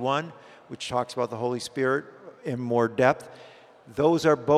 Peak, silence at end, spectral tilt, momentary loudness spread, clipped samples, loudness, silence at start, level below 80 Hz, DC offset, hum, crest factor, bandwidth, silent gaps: -4 dBFS; 0 s; -5.5 dB/octave; 17 LU; under 0.1%; -26 LUFS; 0 s; -62 dBFS; under 0.1%; none; 22 dB; 14 kHz; none